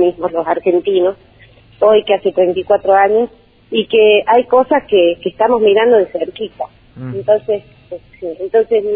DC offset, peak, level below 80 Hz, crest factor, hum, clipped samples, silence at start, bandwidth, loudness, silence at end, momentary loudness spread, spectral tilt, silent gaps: under 0.1%; 0 dBFS; -52 dBFS; 14 dB; none; under 0.1%; 0 s; 4 kHz; -13 LUFS; 0 s; 16 LU; -9 dB/octave; none